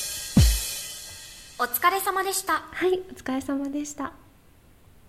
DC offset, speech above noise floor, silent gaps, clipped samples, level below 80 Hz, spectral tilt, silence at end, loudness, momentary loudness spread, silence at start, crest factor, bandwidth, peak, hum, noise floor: under 0.1%; 28 dB; none; under 0.1%; -34 dBFS; -4 dB/octave; 0.9 s; -26 LUFS; 16 LU; 0 s; 20 dB; 15.5 kHz; -8 dBFS; none; -55 dBFS